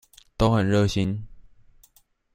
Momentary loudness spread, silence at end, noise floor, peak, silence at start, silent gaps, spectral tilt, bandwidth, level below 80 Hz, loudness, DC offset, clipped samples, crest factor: 14 LU; 0.95 s; -61 dBFS; -6 dBFS; 0.4 s; none; -6.5 dB/octave; 16 kHz; -42 dBFS; -23 LUFS; under 0.1%; under 0.1%; 20 dB